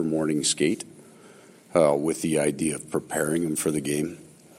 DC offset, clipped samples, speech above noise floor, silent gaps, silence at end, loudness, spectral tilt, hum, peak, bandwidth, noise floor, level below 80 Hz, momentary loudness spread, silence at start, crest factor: under 0.1%; under 0.1%; 26 dB; none; 0.35 s; -25 LUFS; -4 dB/octave; none; -6 dBFS; 16.5 kHz; -51 dBFS; -62 dBFS; 10 LU; 0 s; 20 dB